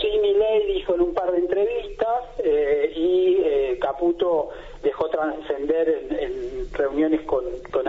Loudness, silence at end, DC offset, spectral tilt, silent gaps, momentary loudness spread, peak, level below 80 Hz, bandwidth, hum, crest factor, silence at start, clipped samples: -23 LUFS; 0 s; under 0.1%; -3.5 dB/octave; none; 8 LU; -8 dBFS; -44 dBFS; 7.2 kHz; none; 14 dB; 0 s; under 0.1%